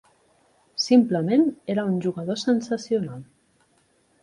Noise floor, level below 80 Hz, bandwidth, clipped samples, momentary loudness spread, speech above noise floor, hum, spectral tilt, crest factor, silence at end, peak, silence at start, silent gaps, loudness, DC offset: -64 dBFS; -68 dBFS; 11 kHz; under 0.1%; 11 LU; 42 dB; none; -6 dB/octave; 18 dB; 1 s; -6 dBFS; 0.8 s; none; -23 LUFS; under 0.1%